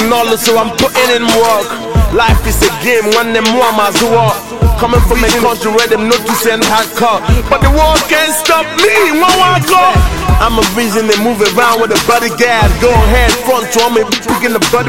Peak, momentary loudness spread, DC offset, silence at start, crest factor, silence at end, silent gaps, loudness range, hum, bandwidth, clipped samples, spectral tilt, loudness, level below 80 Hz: 0 dBFS; 4 LU; 2%; 0 s; 10 dB; 0 s; none; 2 LU; none; 17 kHz; 0.3%; -4 dB/octave; -9 LUFS; -18 dBFS